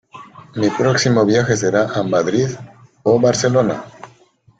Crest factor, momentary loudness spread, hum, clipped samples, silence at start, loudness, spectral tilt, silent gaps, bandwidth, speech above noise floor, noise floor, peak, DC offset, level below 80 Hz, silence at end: 16 dB; 12 LU; none; under 0.1%; 0.15 s; -16 LUFS; -5 dB/octave; none; 9.2 kHz; 37 dB; -52 dBFS; -2 dBFS; under 0.1%; -54 dBFS; 0.55 s